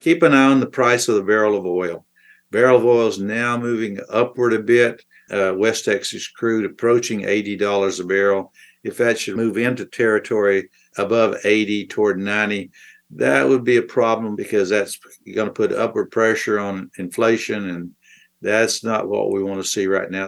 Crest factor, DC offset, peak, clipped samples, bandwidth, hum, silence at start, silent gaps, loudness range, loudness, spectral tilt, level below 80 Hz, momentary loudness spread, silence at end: 18 dB; under 0.1%; 0 dBFS; under 0.1%; 12.5 kHz; none; 0.05 s; none; 3 LU; -19 LUFS; -4.5 dB/octave; -70 dBFS; 11 LU; 0 s